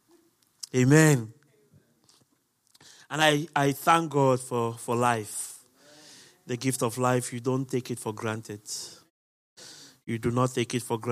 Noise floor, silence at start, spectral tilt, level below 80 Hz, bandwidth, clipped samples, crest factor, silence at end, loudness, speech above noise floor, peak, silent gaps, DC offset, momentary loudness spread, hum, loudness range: -70 dBFS; 0.75 s; -5 dB/octave; -68 dBFS; 15.5 kHz; under 0.1%; 24 dB; 0 s; -26 LUFS; 44 dB; -4 dBFS; 9.10-9.56 s; under 0.1%; 17 LU; none; 6 LU